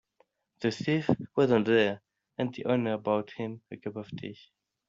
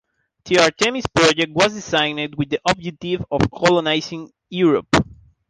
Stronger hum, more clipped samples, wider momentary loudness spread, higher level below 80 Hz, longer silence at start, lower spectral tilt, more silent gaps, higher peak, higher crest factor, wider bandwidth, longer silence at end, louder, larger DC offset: neither; neither; first, 16 LU vs 10 LU; second, -68 dBFS vs -44 dBFS; first, 0.6 s vs 0.45 s; about the same, -5 dB/octave vs -4 dB/octave; neither; second, -8 dBFS vs -2 dBFS; about the same, 22 dB vs 18 dB; second, 7.8 kHz vs 9.8 kHz; first, 0.55 s vs 0.35 s; second, -29 LUFS vs -18 LUFS; neither